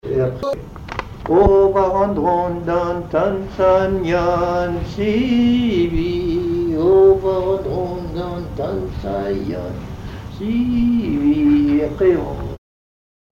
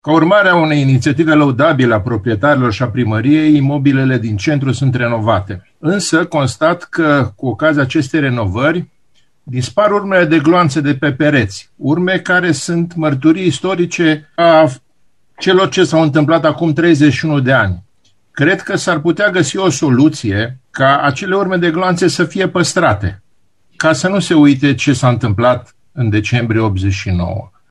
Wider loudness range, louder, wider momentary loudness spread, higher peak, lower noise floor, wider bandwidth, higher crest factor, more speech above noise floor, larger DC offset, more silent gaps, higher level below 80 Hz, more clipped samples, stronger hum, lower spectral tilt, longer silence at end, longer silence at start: first, 6 LU vs 3 LU; second, -18 LUFS vs -13 LUFS; first, 14 LU vs 7 LU; about the same, 0 dBFS vs 0 dBFS; first, under -90 dBFS vs -61 dBFS; second, 7.2 kHz vs 12 kHz; about the same, 16 dB vs 12 dB; first, over 73 dB vs 48 dB; second, under 0.1% vs 0.2%; neither; first, -34 dBFS vs -46 dBFS; neither; neither; first, -8 dB/octave vs -6 dB/octave; first, 0.75 s vs 0.25 s; about the same, 0.05 s vs 0.05 s